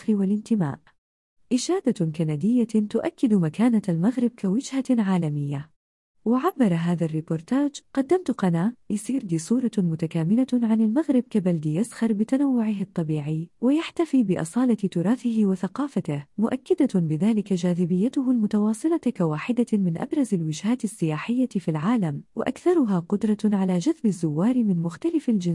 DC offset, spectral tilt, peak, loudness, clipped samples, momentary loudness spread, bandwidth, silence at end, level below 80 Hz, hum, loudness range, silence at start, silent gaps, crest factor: under 0.1%; -7.5 dB/octave; -10 dBFS; -24 LUFS; under 0.1%; 5 LU; 12 kHz; 0 s; -68 dBFS; none; 2 LU; 0 s; 0.98-1.37 s, 5.76-6.14 s; 14 dB